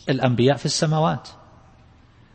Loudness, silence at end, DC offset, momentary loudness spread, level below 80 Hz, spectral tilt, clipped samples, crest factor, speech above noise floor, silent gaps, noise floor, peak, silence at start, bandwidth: -21 LUFS; 1.05 s; under 0.1%; 5 LU; -54 dBFS; -5.5 dB/octave; under 0.1%; 18 dB; 31 dB; none; -51 dBFS; -4 dBFS; 0.05 s; 8.8 kHz